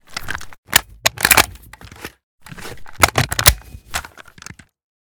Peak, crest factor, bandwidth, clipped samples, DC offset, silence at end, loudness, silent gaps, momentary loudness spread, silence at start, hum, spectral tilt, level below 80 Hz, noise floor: 0 dBFS; 20 dB; over 20 kHz; 0.2%; under 0.1%; 1 s; -16 LUFS; 0.58-0.63 s, 2.23-2.38 s; 25 LU; 0.1 s; none; -1.5 dB/octave; -34 dBFS; -40 dBFS